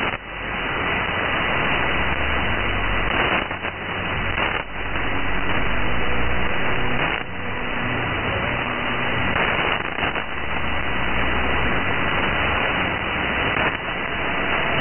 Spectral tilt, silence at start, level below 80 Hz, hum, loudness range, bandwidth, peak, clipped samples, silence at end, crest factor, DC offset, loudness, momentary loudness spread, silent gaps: -1 dB/octave; 0 s; -34 dBFS; none; 2 LU; 3.4 kHz; -6 dBFS; under 0.1%; 0 s; 14 dB; under 0.1%; -22 LUFS; 5 LU; none